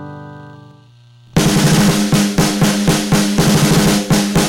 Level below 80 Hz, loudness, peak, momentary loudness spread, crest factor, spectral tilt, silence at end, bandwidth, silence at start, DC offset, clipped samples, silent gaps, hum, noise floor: -34 dBFS; -13 LUFS; -2 dBFS; 7 LU; 12 dB; -4.5 dB/octave; 0 s; 17 kHz; 0 s; under 0.1%; under 0.1%; none; 60 Hz at -45 dBFS; -44 dBFS